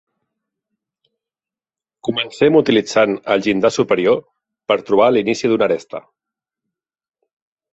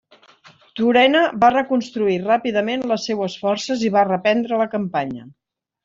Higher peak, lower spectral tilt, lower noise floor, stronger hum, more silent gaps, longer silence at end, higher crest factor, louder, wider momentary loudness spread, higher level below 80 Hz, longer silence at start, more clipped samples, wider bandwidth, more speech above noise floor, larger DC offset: about the same, -2 dBFS vs -2 dBFS; about the same, -5 dB/octave vs -5 dB/octave; first, under -90 dBFS vs -50 dBFS; neither; neither; first, 1.75 s vs 0.55 s; about the same, 18 dB vs 18 dB; first, -16 LUFS vs -19 LUFS; about the same, 9 LU vs 9 LU; about the same, -58 dBFS vs -60 dBFS; first, 2.05 s vs 0.75 s; neither; about the same, 8.2 kHz vs 7.6 kHz; first, over 75 dB vs 32 dB; neither